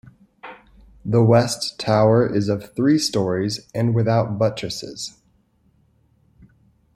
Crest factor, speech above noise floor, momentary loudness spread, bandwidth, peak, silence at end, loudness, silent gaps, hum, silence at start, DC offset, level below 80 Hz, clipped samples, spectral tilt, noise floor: 18 dB; 42 dB; 17 LU; 13 kHz; -2 dBFS; 1.85 s; -20 LUFS; none; none; 0.45 s; under 0.1%; -54 dBFS; under 0.1%; -6 dB/octave; -61 dBFS